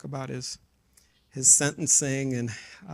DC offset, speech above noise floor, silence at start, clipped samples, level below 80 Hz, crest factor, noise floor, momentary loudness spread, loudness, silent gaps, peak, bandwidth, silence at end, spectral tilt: under 0.1%; 37 dB; 0.05 s; under 0.1%; -62 dBFS; 22 dB; -63 dBFS; 23 LU; -21 LUFS; none; -4 dBFS; 15.5 kHz; 0 s; -2.5 dB/octave